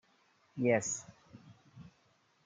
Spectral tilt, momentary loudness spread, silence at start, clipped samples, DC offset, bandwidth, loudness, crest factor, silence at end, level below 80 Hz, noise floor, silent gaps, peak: -5 dB/octave; 26 LU; 0.55 s; under 0.1%; under 0.1%; 9.8 kHz; -33 LUFS; 22 dB; 0.65 s; -78 dBFS; -71 dBFS; none; -16 dBFS